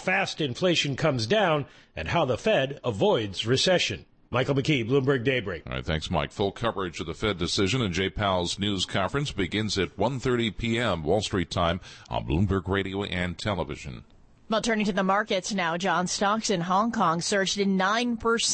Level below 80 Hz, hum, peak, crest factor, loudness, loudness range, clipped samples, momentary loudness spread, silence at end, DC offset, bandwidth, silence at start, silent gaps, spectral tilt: -46 dBFS; none; -12 dBFS; 14 dB; -26 LUFS; 3 LU; under 0.1%; 6 LU; 0 s; under 0.1%; 8.8 kHz; 0 s; none; -4.5 dB/octave